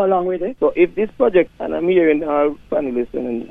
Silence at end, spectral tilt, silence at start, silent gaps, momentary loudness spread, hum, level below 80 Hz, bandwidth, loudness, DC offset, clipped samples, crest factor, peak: 0.05 s; -8.5 dB/octave; 0 s; none; 7 LU; none; -48 dBFS; 3.8 kHz; -18 LUFS; under 0.1%; under 0.1%; 16 dB; -2 dBFS